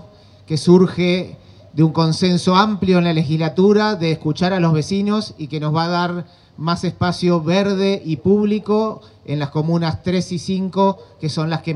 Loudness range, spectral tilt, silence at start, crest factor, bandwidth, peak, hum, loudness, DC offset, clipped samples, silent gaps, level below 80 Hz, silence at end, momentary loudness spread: 3 LU; -7 dB/octave; 0.5 s; 16 dB; 11 kHz; 0 dBFS; none; -18 LUFS; under 0.1%; under 0.1%; none; -52 dBFS; 0 s; 10 LU